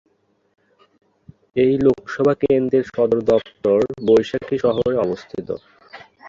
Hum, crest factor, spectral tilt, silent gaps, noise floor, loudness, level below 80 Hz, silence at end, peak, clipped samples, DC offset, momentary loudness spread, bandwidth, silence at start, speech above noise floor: none; 16 dB; -7.5 dB/octave; none; -44 dBFS; -19 LUFS; -52 dBFS; 0 s; -4 dBFS; under 0.1%; under 0.1%; 12 LU; 7.4 kHz; 1.55 s; 26 dB